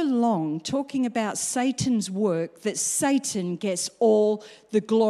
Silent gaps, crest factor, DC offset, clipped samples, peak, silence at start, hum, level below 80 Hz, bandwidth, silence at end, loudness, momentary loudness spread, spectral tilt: none; 14 dB; under 0.1%; under 0.1%; -10 dBFS; 0 s; none; -64 dBFS; 15 kHz; 0 s; -25 LUFS; 6 LU; -4.5 dB/octave